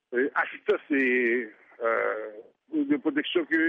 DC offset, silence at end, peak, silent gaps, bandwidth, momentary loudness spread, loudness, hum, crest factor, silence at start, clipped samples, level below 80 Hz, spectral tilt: under 0.1%; 0 s; -12 dBFS; none; 4.7 kHz; 10 LU; -27 LUFS; none; 14 dB; 0.1 s; under 0.1%; -82 dBFS; -6 dB/octave